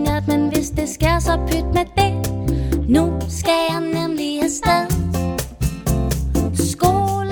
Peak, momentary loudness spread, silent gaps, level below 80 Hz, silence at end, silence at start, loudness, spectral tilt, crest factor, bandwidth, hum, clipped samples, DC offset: 0 dBFS; 5 LU; none; -26 dBFS; 0 s; 0 s; -19 LUFS; -5.5 dB/octave; 18 dB; over 20 kHz; none; under 0.1%; under 0.1%